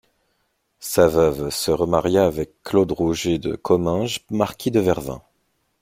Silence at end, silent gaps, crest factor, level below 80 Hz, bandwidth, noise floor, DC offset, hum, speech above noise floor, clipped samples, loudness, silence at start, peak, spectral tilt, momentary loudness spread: 0.65 s; none; 20 dB; -46 dBFS; 16.5 kHz; -70 dBFS; under 0.1%; none; 50 dB; under 0.1%; -20 LUFS; 0.8 s; -2 dBFS; -5.5 dB/octave; 8 LU